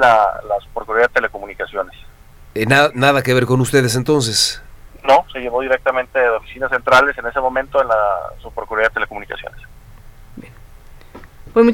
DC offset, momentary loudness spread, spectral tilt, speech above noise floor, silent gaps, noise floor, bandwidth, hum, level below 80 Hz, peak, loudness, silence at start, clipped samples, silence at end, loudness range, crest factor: under 0.1%; 14 LU; -4.5 dB/octave; 24 dB; none; -41 dBFS; 17.5 kHz; none; -40 dBFS; 0 dBFS; -16 LUFS; 0 s; under 0.1%; 0 s; 6 LU; 18 dB